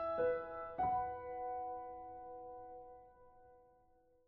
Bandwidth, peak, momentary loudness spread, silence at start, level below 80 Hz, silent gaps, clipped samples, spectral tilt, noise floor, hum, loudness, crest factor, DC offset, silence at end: 4.3 kHz; -26 dBFS; 18 LU; 0 s; -68 dBFS; none; under 0.1%; -5 dB/octave; -71 dBFS; none; -42 LUFS; 16 dB; under 0.1%; 0.6 s